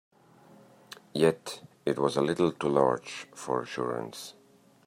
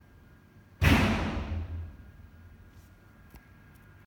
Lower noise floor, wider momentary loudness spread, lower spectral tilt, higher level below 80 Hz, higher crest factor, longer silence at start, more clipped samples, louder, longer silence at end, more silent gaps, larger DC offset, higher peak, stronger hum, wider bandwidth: about the same, -57 dBFS vs -56 dBFS; second, 16 LU vs 25 LU; about the same, -5.5 dB/octave vs -6 dB/octave; second, -70 dBFS vs -40 dBFS; about the same, 22 dB vs 24 dB; about the same, 0.9 s vs 0.8 s; neither; about the same, -29 LUFS vs -28 LUFS; second, 0.55 s vs 0.7 s; neither; neither; about the same, -10 dBFS vs -10 dBFS; neither; second, 16 kHz vs 18.5 kHz